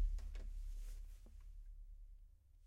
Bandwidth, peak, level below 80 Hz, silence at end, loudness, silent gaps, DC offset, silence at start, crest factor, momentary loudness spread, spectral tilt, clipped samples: 9.8 kHz; -30 dBFS; -48 dBFS; 0 s; -55 LUFS; none; under 0.1%; 0 s; 16 dB; 14 LU; -5.5 dB/octave; under 0.1%